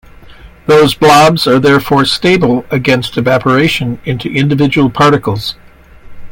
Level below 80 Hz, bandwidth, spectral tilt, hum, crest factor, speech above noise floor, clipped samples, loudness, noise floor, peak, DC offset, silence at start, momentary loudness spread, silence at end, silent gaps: -38 dBFS; 17.5 kHz; -5.5 dB/octave; none; 10 dB; 25 dB; under 0.1%; -10 LUFS; -35 dBFS; 0 dBFS; under 0.1%; 0.3 s; 10 LU; 0.05 s; none